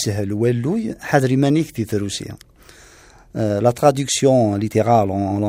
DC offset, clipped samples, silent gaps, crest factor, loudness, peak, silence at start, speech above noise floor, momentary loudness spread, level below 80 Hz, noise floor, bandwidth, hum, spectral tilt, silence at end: under 0.1%; under 0.1%; none; 18 dB; -18 LUFS; 0 dBFS; 0 s; 29 dB; 9 LU; -52 dBFS; -47 dBFS; 16 kHz; none; -5.5 dB/octave; 0 s